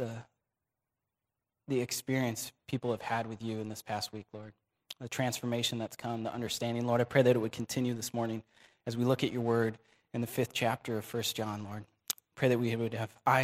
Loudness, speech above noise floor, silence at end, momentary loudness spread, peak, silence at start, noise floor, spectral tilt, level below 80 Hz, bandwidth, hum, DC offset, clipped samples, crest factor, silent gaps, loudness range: -34 LUFS; 56 dB; 0 s; 13 LU; -10 dBFS; 0 s; -89 dBFS; -5 dB/octave; -70 dBFS; 16 kHz; none; under 0.1%; under 0.1%; 24 dB; none; 5 LU